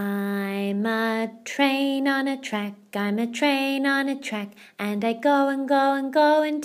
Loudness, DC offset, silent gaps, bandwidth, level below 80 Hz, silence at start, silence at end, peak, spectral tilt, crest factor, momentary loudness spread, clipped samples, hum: -24 LUFS; under 0.1%; none; 15.5 kHz; -82 dBFS; 0 s; 0 s; -6 dBFS; -5 dB/octave; 18 dB; 9 LU; under 0.1%; none